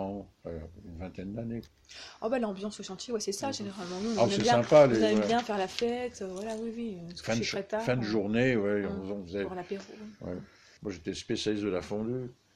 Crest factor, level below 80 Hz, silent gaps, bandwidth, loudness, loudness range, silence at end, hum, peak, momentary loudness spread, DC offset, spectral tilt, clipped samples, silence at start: 22 dB; -60 dBFS; none; 13 kHz; -30 LUFS; 9 LU; 0.2 s; none; -8 dBFS; 17 LU; under 0.1%; -5 dB/octave; under 0.1%; 0 s